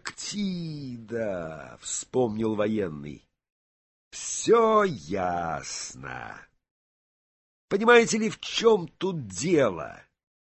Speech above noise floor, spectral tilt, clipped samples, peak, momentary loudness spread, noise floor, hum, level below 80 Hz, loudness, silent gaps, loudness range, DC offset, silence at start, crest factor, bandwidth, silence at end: over 64 dB; -4 dB/octave; under 0.1%; -6 dBFS; 18 LU; under -90 dBFS; none; -58 dBFS; -26 LUFS; 3.52-4.11 s, 6.71-7.68 s; 7 LU; under 0.1%; 0.05 s; 22 dB; 8.6 kHz; 0.65 s